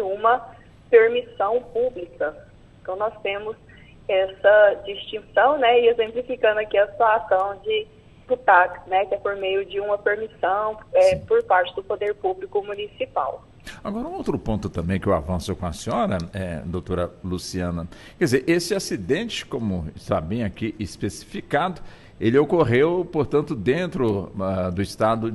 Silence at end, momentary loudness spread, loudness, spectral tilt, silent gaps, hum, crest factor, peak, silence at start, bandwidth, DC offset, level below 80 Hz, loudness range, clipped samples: 0 s; 13 LU; -22 LUFS; -5.5 dB/octave; none; none; 20 dB; -2 dBFS; 0 s; 12.5 kHz; under 0.1%; -46 dBFS; 7 LU; under 0.1%